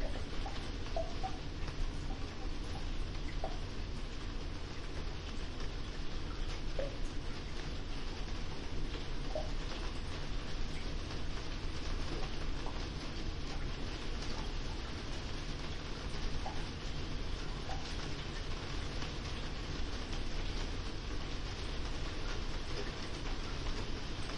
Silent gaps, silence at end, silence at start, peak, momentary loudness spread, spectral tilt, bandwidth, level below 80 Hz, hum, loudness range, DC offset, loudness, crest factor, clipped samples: none; 0 s; 0 s; -24 dBFS; 3 LU; -5 dB/octave; 11 kHz; -40 dBFS; none; 2 LU; under 0.1%; -43 LUFS; 14 dB; under 0.1%